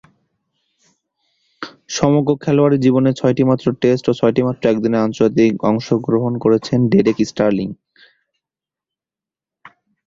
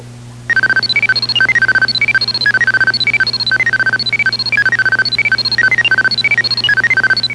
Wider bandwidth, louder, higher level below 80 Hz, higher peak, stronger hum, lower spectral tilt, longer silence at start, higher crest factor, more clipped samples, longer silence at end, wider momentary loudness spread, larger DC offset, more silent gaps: second, 7.6 kHz vs 11 kHz; second, -16 LUFS vs -11 LUFS; second, -52 dBFS vs -46 dBFS; about the same, -2 dBFS vs -2 dBFS; second, none vs 60 Hz at -30 dBFS; first, -7 dB/octave vs -2 dB/octave; first, 1.6 s vs 0 s; first, 16 dB vs 10 dB; neither; first, 2.3 s vs 0 s; first, 5 LU vs 2 LU; second, under 0.1% vs 0.1%; neither